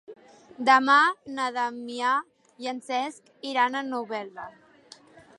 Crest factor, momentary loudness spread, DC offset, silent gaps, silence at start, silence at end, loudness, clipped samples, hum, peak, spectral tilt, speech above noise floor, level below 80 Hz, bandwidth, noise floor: 20 dB; 17 LU; under 0.1%; none; 0.1 s; 0.9 s; -25 LUFS; under 0.1%; none; -6 dBFS; -2.5 dB/octave; 28 dB; -78 dBFS; 11.5 kHz; -53 dBFS